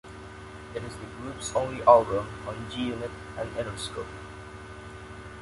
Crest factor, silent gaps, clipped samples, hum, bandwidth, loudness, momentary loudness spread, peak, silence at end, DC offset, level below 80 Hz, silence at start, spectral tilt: 26 dB; none; under 0.1%; none; 11.5 kHz; -28 LUFS; 23 LU; -4 dBFS; 0 s; under 0.1%; -50 dBFS; 0.05 s; -5 dB/octave